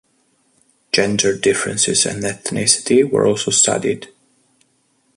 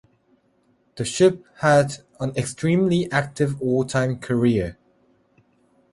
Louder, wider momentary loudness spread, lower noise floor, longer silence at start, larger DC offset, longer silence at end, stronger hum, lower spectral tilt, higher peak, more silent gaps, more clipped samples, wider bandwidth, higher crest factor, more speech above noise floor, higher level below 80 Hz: first, -16 LUFS vs -22 LUFS; about the same, 8 LU vs 10 LU; about the same, -62 dBFS vs -63 dBFS; about the same, 0.95 s vs 0.95 s; neither; about the same, 1.1 s vs 1.2 s; neither; second, -2.5 dB/octave vs -6 dB/octave; first, 0 dBFS vs -4 dBFS; neither; neither; about the same, 11.5 kHz vs 11.5 kHz; about the same, 18 dB vs 18 dB; about the same, 45 dB vs 43 dB; about the same, -54 dBFS vs -52 dBFS